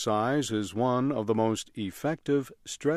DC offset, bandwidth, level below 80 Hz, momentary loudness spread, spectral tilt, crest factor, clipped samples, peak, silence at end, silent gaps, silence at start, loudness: under 0.1%; 15 kHz; -64 dBFS; 6 LU; -5.5 dB/octave; 16 dB; under 0.1%; -12 dBFS; 0 s; none; 0 s; -29 LUFS